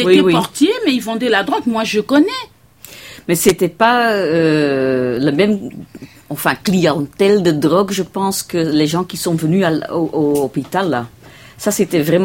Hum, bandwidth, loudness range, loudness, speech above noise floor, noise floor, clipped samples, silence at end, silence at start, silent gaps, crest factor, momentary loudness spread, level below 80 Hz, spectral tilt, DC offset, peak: none; 16.5 kHz; 2 LU; -15 LUFS; 25 dB; -39 dBFS; under 0.1%; 0 s; 0 s; none; 16 dB; 9 LU; -50 dBFS; -5 dB/octave; under 0.1%; 0 dBFS